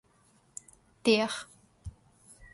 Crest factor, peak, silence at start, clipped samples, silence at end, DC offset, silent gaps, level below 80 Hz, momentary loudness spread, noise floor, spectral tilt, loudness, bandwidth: 22 dB; -12 dBFS; 1.05 s; under 0.1%; 0.1 s; under 0.1%; none; -58 dBFS; 23 LU; -65 dBFS; -3.5 dB/octave; -29 LUFS; 11.5 kHz